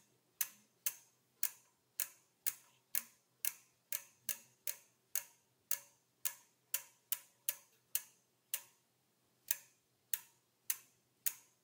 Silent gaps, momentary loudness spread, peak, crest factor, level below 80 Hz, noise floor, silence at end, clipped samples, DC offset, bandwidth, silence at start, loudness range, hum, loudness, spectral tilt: none; 6 LU; -14 dBFS; 32 dB; under -90 dBFS; -78 dBFS; 0.25 s; under 0.1%; under 0.1%; 19 kHz; 0.4 s; 2 LU; none; -42 LUFS; 2.5 dB/octave